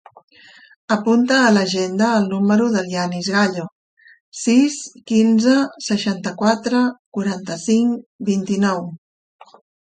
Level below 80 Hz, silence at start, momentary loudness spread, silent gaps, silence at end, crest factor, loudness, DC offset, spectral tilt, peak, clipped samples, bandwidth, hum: -64 dBFS; 0.9 s; 10 LU; 3.72-3.97 s, 4.20-4.32 s, 6.99-7.12 s, 8.06-8.19 s; 0.95 s; 16 dB; -18 LUFS; under 0.1%; -5 dB/octave; -2 dBFS; under 0.1%; 9.4 kHz; none